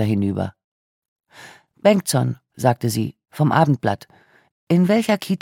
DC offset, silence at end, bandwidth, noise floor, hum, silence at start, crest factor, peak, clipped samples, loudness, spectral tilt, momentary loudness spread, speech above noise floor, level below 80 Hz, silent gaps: under 0.1%; 0.05 s; 17 kHz; -45 dBFS; none; 0 s; 18 dB; -2 dBFS; under 0.1%; -20 LUFS; -6 dB/octave; 10 LU; 27 dB; -60 dBFS; 0.64-1.02 s, 1.08-1.16 s, 4.51-4.67 s